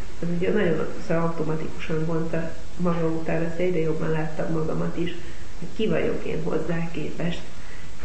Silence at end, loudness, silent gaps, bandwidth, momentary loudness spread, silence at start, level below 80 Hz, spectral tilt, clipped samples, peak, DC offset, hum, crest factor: 0 s; -27 LUFS; none; 8.6 kHz; 12 LU; 0 s; -42 dBFS; -7 dB/octave; under 0.1%; -10 dBFS; 8%; none; 14 dB